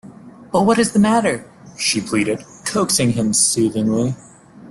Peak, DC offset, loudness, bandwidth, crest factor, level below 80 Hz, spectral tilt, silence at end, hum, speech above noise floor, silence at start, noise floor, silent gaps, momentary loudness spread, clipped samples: -4 dBFS; under 0.1%; -17 LUFS; 12.5 kHz; 14 dB; -52 dBFS; -4 dB/octave; 0 s; none; 23 dB; 0.05 s; -40 dBFS; none; 9 LU; under 0.1%